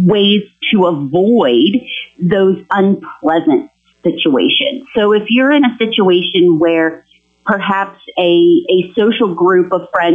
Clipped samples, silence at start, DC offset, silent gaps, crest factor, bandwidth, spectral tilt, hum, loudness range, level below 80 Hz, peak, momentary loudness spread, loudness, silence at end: under 0.1%; 0 s; under 0.1%; none; 10 dB; 3.8 kHz; -8 dB/octave; none; 2 LU; -56 dBFS; -2 dBFS; 7 LU; -12 LUFS; 0 s